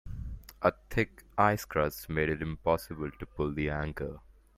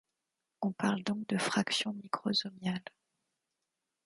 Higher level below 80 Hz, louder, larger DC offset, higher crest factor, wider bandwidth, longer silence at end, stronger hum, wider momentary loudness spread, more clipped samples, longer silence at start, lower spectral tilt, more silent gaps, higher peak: first, -46 dBFS vs -78 dBFS; about the same, -32 LUFS vs -34 LUFS; neither; about the same, 22 dB vs 20 dB; first, 16 kHz vs 11.5 kHz; second, 0.4 s vs 1.25 s; neither; first, 13 LU vs 7 LU; neither; second, 0.05 s vs 0.6 s; first, -6.5 dB/octave vs -4 dB/octave; neither; first, -10 dBFS vs -16 dBFS